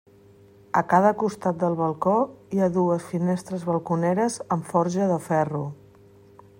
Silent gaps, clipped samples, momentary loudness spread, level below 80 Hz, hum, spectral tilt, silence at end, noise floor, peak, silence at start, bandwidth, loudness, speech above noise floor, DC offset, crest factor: none; under 0.1%; 7 LU; -64 dBFS; none; -7 dB/octave; 0.85 s; -52 dBFS; -6 dBFS; 0.75 s; 16 kHz; -24 LUFS; 29 dB; under 0.1%; 20 dB